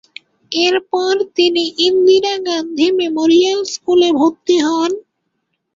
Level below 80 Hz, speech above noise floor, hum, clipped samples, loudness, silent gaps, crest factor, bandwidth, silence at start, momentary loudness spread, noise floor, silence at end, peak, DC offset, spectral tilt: -60 dBFS; 57 dB; none; under 0.1%; -14 LUFS; none; 14 dB; 7.6 kHz; 0.5 s; 8 LU; -70 dBFS; 0.75 s; -2 dBFS; under 0.1%; -2.5 dB/octave